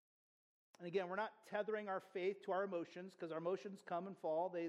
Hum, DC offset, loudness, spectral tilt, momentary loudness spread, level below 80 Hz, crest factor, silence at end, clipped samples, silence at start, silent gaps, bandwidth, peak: none; under 0.1%; -45 LUFS; -6.5 dB/octave; 6 LU; under -90 dBFS; 16 dB; 0 s; under 0.1%; 0.8 s; none; 12 kHz; -28 dBFS